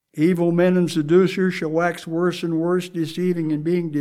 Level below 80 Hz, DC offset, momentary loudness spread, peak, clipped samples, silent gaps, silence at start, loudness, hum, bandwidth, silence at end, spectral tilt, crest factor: -68 dBFS; 0.2%; 6 LU; -4 dBFS; under 0.1%; none; 0.15 s; -20 LUFS; none; 14 kHz; 0 s; -7 dB/octave; 16 dB